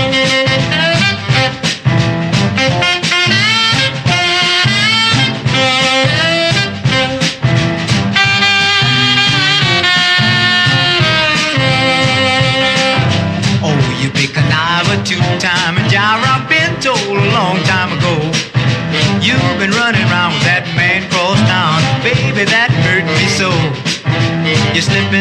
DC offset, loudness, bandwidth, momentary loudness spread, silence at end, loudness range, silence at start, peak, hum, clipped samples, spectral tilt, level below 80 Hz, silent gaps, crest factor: under 0.1%; -11 LUFS; 11.5 kHz; 5 LU; 0 s; 3 LU; 0 s; 0 dBFS; none; under 0.1%; -4 dB/octave; -40 dBFS; none; 12 dB